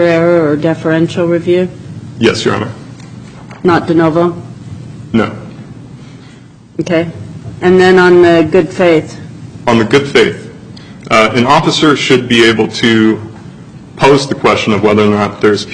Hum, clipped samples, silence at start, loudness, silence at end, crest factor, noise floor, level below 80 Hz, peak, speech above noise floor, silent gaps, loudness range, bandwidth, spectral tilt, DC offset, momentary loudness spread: none; under 0.1%; 0 s; -10 LUFS; 0 s; 10 dB; -36 dBFS; -44 dBFS; 0 dBFS; 27 dB; none; 6 LU; 10.5 kHz; -5.5 dB/octave; under 0.1%; 22 LU